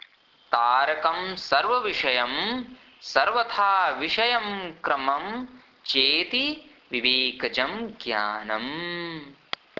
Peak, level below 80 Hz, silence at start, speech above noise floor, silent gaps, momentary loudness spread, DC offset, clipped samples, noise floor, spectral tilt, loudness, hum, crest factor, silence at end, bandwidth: -4 dBFS; -64 dBFS; 0.5 s; 29 dB; none; 14 LU; under 0.1%; under 0.1%; -54 dBFS; -3.5 dB/octave; -24 LUFS; none; 22 dB; 0.45 s; 6 kHz